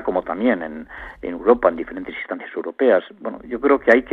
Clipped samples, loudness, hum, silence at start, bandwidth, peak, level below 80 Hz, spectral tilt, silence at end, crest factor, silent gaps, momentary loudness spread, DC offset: under 0.1%; -20 LUFS; none; 0 s; 6.6 kHz; 0 dBFS; -50 dBFS; -7 dB/octave; 0 s; 20 dB; none; 15 LU; under 0.1%